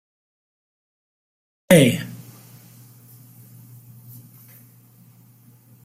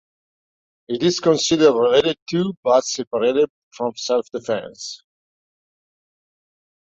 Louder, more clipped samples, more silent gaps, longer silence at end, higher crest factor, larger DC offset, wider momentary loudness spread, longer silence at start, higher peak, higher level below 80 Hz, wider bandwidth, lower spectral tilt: first, -16 LUFS vs -19 LUFS; neither; second, none vs 2.22-2.26 s, 2.57-2.63 s, 3.07-3.11 s, 3.50-3.71 s; first, 3.7 s vs 1.9 s; about the same, 24 dB vs 20 dB; neither; first, 29 LU vs 14 LU; first, 1.7 s vs 0.9 s; about the same, -2 dBFS vs -2 dBFS; about the same, -58 dBFS vs -62 dBFS; first, 16 kHz vs 8 kHz; about the same, -5 dB/octave vs -4 dB/octave